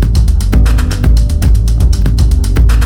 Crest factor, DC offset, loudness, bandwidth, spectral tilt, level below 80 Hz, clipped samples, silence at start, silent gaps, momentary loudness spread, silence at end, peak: 8 dB; under 0.1%; -11 LUFS; 13.5 kHz; -6.5 dB/octave; -8 dBFS; 0.1%; 0 s; none; 1 LU; 0 s; 0 dBFS